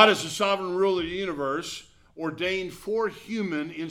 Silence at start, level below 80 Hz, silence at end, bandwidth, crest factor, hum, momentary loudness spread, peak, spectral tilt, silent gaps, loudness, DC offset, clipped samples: 0 s; -58 dBFS; 0 s; 16 kHz; 24 dB; none; 9 LU; -2 dBFS; -3.5 dB/octave; none; -27 LUFS; under 0.1%; under 0.1%